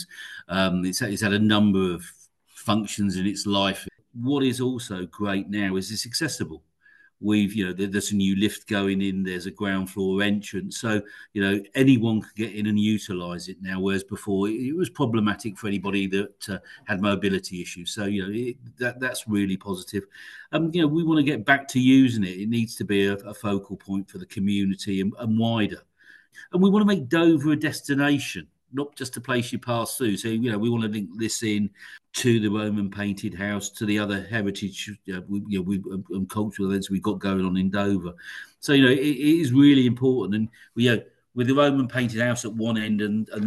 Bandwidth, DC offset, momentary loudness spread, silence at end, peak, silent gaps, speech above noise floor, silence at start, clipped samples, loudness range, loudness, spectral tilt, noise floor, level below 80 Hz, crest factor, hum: 12.5 kHz; under 0.1%; 12 LU; 0 s; -4 dBFS; none; 34 dB; 0 s; under 0.1%; 7 LU; -24 LUFS; -5.5 dB/octave; -58 dBFS; -62 dBFS; 20 dB; none